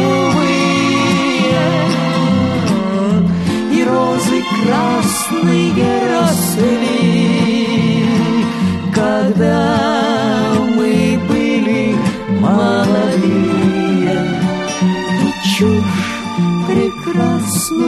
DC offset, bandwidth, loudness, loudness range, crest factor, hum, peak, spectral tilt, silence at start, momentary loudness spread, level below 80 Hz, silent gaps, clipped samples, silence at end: under 0.1%; 13.5 kHz; -14 LUFS; 1 LU; 12 dB; none; -2 dBFS; -5.5 dB/octave; 0 s; 3 LU; -44 dBFS; none; under 0.1%; 0 s